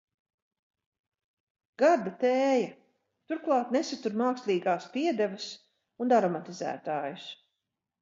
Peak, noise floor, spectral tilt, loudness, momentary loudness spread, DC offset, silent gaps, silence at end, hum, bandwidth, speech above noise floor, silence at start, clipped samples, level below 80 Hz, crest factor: -12 dBFS; -85 dBFS; -5 dB/octave; -29 LUFS; 13 LU; under 0.1%; none; 0.65 s; none; 7.8 kHz; 57 dB; 1.8 s; under 0.1%; -84 dBFS; 18 dB